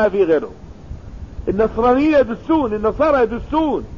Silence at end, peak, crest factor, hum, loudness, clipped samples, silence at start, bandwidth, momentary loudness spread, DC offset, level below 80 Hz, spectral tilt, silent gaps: 0 s; -4 dBFS; 14 dB; none; -17 LUFS; under 0.1%; 0 s; 7.2 kHz; 20 LU; 0.5%; -36 dBFS; -8 dB/octave; none